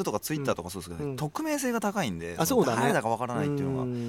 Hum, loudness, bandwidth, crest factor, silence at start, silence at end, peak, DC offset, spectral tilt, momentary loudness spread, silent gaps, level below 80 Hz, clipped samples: none; -29 LUFS; 17.5 kHz; 16 dB; 0 s; 0 s; -12 dBFS; under 0.1%; -5 dB/octave; 9 LU; none; -58 dBFS; under 0.1%